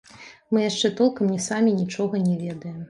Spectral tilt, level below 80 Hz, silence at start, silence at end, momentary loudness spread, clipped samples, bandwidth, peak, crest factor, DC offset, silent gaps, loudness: -5.5 dB/octave; -66 dBFS; 0.15 s; 0.05 s; 4 LU; under 0.1%; 11.5 kHz; -8 dBFS; 16 dB; under 0.1%; none; -23 LUFS